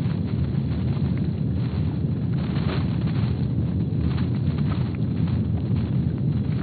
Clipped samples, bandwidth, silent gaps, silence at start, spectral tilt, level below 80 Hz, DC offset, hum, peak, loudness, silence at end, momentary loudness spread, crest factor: under 0.1%; 4.7 kHz; none; 0 s; -9 dB/octave; -36 dBFS; under 0.1%; none; -10 dBFS; -25 LUFS; 0 s; 1 LU; 14 dB